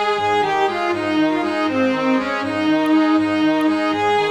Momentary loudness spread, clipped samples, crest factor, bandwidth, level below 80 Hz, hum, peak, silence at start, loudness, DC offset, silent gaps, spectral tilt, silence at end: 4 LU; under 0.1%; 12 dB; 11.5 kHz; -58 dBFS; none; -6 dBFS; 0 s; -18 LUFS; under 0.1%; none; -5 dB/octave; 0 s